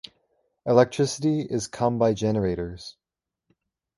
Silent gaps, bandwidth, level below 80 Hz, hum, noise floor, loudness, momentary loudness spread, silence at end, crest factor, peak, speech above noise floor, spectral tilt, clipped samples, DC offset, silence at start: none; 11.5 kHz; -52 dBFS; none; -88 dBFS; -24 LUFS; 15 LU; 1.05 s; 22 dB; -2 dBFS; 65 dB; -6 dB/octave; under 0.1%; under 0.1%; 0.65 s